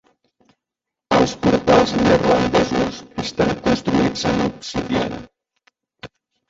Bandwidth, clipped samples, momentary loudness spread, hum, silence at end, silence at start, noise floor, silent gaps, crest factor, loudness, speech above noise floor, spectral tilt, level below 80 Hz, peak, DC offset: 8 kHz; under 0.1%; 11 LU; none; 0.45 s; 1.1 s; -85 dBFS; none; 18 dB; -18 LUFS; 66 dB; -5.5 dB/octave; -42 dBFS; -2 dBFS; under 0.1%